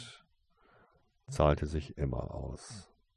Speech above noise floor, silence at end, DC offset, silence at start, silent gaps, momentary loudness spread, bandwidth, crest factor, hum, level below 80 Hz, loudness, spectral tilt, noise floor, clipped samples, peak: 36 dB; 0.35 s; under 0.1%; 0 s; none; 20 LU; 11.5 kHz; 24 dB; none; -44 dBFS; -34 LUFS; -6.5 dB/octave; -69 dBFS; under 0.1%; -12 dBFS